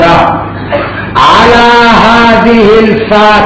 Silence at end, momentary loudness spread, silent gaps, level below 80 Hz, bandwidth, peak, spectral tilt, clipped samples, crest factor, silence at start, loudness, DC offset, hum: 0 s; 10 LU; none; -26 dBFS; 8 kHz; 0 dBFS; -5.5 dB/octave; 10%; 4 dB; 0 s; -4 LUFS; under 0.1%; none